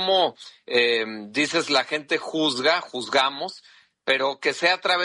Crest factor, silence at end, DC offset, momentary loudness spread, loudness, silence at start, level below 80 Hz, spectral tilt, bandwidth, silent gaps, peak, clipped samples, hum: 18 dB; 0 s; under 0.1%; 7 LU; -23 LUFS; 0 s; -74 dBFS; -2.5 dB/octave; 11.5 kHz; none; -6 dBFS; under 0.1%; none